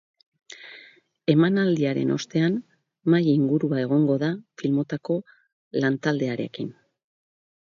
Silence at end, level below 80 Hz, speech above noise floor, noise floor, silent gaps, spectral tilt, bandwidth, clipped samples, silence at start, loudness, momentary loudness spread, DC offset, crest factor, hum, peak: 1.05 s; -70 dBFS; 30 dB; -53 dBFS; 5.53-5.71 s; -7.5 dB/octave; 7.4 kHz; under 0.1%; 0.5 s; -24 LUFS; 13 LU; under 0.1%; 20 dB; none; -6 dBFS